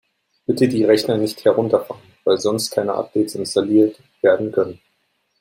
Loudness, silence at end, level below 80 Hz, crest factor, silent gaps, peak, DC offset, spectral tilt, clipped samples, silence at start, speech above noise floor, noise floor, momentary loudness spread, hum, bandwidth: -19 LUFS; 0.65 s; -62 dBFS; 16 dB; none; -2 dBFS; under 0.1%; -5.5 dB/octave; under 0.1%; 0.5 s; 50 dB; -68 dBFS; 8 LU; none; 16.5 kHz